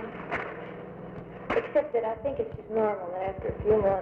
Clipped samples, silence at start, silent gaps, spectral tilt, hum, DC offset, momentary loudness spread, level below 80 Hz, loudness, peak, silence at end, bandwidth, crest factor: under 0.1%; 0 s; none; -8.5 dB/octave; none; under 0.1%; 16 LU; -50 dBFS; -30 LUFS; -12 dBFS; 0 s; 5.2 kHz; 16 dB